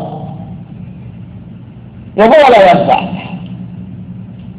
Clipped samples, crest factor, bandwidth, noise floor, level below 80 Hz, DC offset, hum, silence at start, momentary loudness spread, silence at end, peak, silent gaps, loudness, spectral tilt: under 0.1%; 12 dB; 9.4 kHz; -31 dBFS; -42 dBFS; under 0.1%; none; 0 s; 26 LU; 0 s; 0 dBFS; none; -8 LUFS; -7 dB/octave